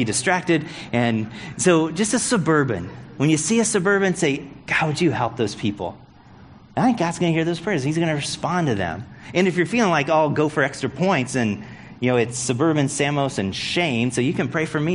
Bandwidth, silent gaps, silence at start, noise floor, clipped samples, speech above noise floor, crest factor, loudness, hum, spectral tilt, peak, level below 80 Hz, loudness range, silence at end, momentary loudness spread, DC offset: 11 kHz; none; 0 s; -46 dBFS; under 0.1%; 25 dB; 18 dB; -21 LUFS; none; -4.5 dB/octave; -4 dBFS; -54 dBFS; 3 LU; 0 s; 7 LU; under 0.1%